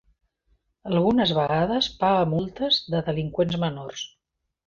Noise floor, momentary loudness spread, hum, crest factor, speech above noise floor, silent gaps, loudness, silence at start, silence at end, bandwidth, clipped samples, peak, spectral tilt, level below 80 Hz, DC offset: -81 dBFS; 13 LU; none; 16 dB; 57 dB; none; -23 LUFS; 0.85 s; 0.6 s; 7.4 kHz; under 0.1%; -8 dBFS; -6 dB/octave; -52 dBFS; under 0.1%